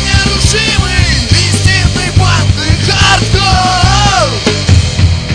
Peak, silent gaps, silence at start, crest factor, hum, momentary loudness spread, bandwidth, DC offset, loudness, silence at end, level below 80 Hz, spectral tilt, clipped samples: 0 dBFS; none; 0 s; 8 dB; none; 3 LU; 10 kHz; 0.4%; -9 LUFS; 0 s; -16 dBFS; -4 dB/octave; 1%